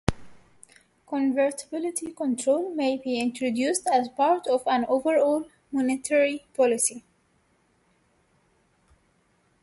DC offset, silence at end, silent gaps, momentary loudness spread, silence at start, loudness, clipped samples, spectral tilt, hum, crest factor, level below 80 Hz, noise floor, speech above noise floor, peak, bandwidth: under 0.1%; 2.65 s; none; 8 LU; 0.1 s; -25 LUFS; under 0.1%; -4 dB/octave; none; 24 dB; -52 dBFS; -67 dBFS; 42 dB; -4 dBFS; 12 kHz